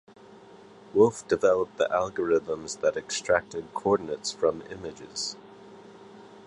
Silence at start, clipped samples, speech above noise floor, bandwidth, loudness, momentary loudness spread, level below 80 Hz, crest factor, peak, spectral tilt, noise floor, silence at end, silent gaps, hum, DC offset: 0.3 s; under 0.1%; 24 dB; 11 kHz; -27 LUFS; 14 LU; -60 dBFS; 22 dB; -6 dBFS; -4 dB/octave; -50 dBFS; 0.05 s; none; none; under 0.1%